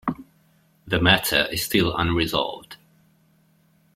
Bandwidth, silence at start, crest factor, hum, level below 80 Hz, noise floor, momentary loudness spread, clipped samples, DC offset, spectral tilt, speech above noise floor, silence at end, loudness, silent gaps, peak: 16.5 kHz; 0.05 s; 24 dB; none; -46 dBFS; -61 dBFS; 13 LU; under 0.1%; under 0.1%; -4 dB/octave; 39 dB; 1.2 s; -21 LUFS; none; -2 dBFS